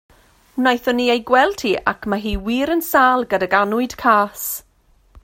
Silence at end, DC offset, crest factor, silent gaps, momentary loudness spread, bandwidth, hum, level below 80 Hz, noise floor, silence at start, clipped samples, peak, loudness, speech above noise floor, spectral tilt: 0.65 s; under 0.1%; 18 dB; none; 8 LU; 16.5 kHz; none; -40 dBFS; -50 dBFS; 0.55 s; under 0.1%; 0 dBFS; -18 LUFS; 32 dB; -4 dB/octave